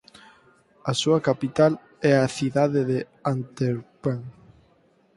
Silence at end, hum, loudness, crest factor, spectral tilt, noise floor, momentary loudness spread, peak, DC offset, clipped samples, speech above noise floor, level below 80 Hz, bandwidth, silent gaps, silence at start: 0.85 s; none; -24 LUFS; 20 dB; -6 dB/octave; -61 dBFS; 9 LU; -6 dBFS; under 0.1%; under 0.1%; 38 dB; -62 dBFS; 11.5 kHz; none; 0.85 s